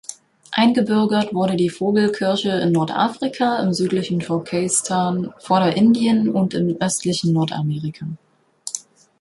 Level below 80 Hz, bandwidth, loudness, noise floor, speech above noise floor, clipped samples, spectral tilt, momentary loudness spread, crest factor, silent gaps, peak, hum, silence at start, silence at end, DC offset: -60 dBFS; 11.5 kHz; -19 LUFS; -38 dBFS; 20 dB; under 0.1%; -5 dB/octave; 13 LU; 16 dB; none; -2 dBFS; none; 0.1 s; 0.4 s; under 0.1%